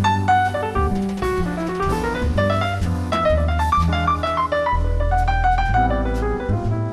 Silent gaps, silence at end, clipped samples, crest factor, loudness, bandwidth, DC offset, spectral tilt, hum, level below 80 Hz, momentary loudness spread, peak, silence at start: none; 0 s; under 0.1%; 14 dB; -20 LUFS; 13 kHz; under 0.1%; -6.5 dB/octave; none; -26 dBFS; 4 LU; -6 dBFS; 0 s